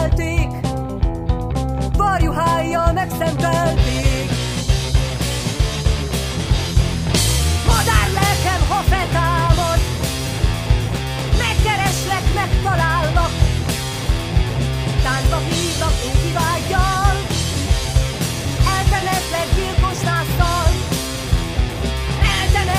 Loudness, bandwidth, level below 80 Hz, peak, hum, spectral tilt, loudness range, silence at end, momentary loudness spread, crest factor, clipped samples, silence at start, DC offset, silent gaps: -18 LUFS; 16 kHz; -22 dBFS; 0 dBFS; none; -4.5 dB/octave; 2 LU; 0 s; 5 LU; 16 dB; under 0.1%; 0 s; under 0.1%; none